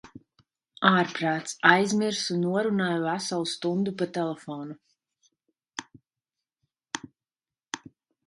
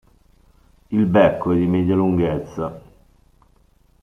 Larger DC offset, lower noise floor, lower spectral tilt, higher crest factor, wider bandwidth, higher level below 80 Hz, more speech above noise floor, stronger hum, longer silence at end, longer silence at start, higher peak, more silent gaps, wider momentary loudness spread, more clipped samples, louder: neither; first, under -90 dBFS vs -56 dBFS; second, -4.5 dB/octave vs -9 dB/octave; first, 26 dB vs 18 dB; first, 11.5 kHz vs 6.2 kHz; second, -72 dBFS vs -48 dBFS; first, over 64 dB vs 39 dB; neither; second, 0.5 s vs 1.25 s; second, 0.05 s vs 0.9 s; about the same, -2 dBFS vs -2 dBFS; neither; first, 18 LU vs 13 LU; neither; second, -26 LUFS vs -19 LUFS